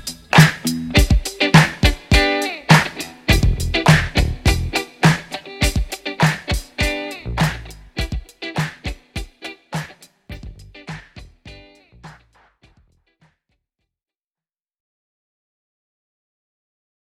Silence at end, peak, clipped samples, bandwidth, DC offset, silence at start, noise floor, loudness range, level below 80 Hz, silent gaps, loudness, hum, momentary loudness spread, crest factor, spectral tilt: 5.1 s; 0 dBFS; under 0.1%; 16.5 kHz; under 0.1%; 0.05 s; under -90 dBFS; 20 LU; -28 dBFS; none; -18 LUFS; none; 22 LU; 20 dB; -5 dB/octave